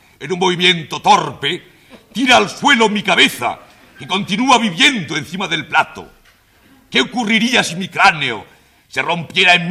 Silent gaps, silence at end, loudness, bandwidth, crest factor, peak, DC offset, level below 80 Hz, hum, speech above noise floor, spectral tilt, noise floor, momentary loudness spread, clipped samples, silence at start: none; 0 s; -14 LUFS; 15.5 kHz; 16 dB; 0 dBFS; under 0.1%; -54 dBFS; none; 36 dB; -3 dB/octave; -51 dBFS; 11 LU; under 0.1%; 0.2 s